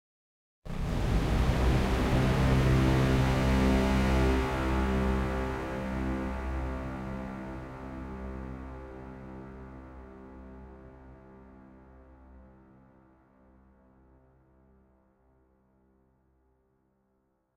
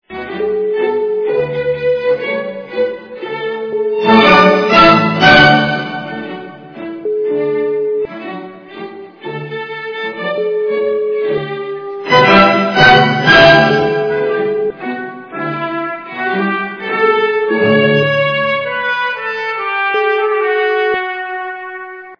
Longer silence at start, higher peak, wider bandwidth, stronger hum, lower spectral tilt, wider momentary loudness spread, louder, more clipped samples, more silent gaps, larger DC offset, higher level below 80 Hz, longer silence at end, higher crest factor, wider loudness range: first, 0.65 s vs 0.1 s; second, -14 dBFS vs 0 dBFS; first, 15 kHz vs 5.4 kHz; neither; about the same, -7 dB/octave vs -6 dB/octave; first, 23 LU vs 18 LU; second, -29 LUFS vs -12 LUFS; second, under 0.1% vs 0.3%; neither; neither; first, -36 dBFS vs -44 dBFS; first, 5.1 s vs 0.05 s; about the same, 18 dB vs 14 dB; first, 22 LU vs 11 LU